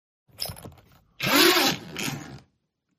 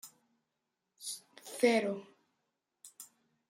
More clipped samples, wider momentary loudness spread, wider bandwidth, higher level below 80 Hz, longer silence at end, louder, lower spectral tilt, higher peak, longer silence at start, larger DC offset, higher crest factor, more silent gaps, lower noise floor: neither; second, 22 LU vs 25 LU; about the same, 15.5 kHz vs 16 kHz; first, -60 dBFS vs -88 dBFS; first, 0.6 s vs 0.45 s; first, -22 LUFS vs -34 LUFS; about the same, -2.5 dB/octave vs -3.5 dB/octave; first, -4 dBFS vs -14 dBFS; first, 0.4 s vs 0.05 s; neither; about the same, 22 dB vs 24 dB; neither; second, -75 dBFS vs -86 dBFS